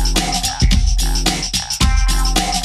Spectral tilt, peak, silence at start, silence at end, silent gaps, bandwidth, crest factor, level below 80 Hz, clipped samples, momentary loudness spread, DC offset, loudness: -3 dB/octave; -2 dBFS; 0 s; 0 s; none; 14.5 kHz; 14 dB; -16 dBFS; under 0.1%; 2 LU; under 0.1%; -17 LUFS